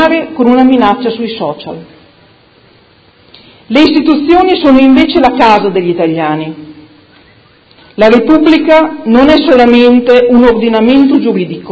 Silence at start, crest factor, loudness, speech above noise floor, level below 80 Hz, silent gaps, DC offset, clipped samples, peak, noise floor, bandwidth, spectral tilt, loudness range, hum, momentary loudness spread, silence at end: 0 s; 8 dB; -7 LUFS; 37 dB; -38 dBFS; none; under 0.1%; 2%; 0 dBFS; -44 dBFS; 8 kHz; -7 dB/octave; 7 LU; none; 12 LU; 0 s